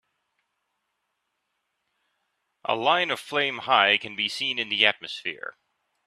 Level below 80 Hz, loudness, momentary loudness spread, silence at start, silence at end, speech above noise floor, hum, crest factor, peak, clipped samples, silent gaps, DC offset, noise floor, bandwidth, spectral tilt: -76 dBFS; -23 LUFS; 13 LU; 2.7 s; 0.55 s; 53 dB; none; 26 dB; -2 dBFS; under 0.1%; none; under 0.1%; -78 dBFS; 14 kHz; -2.5 dB/octave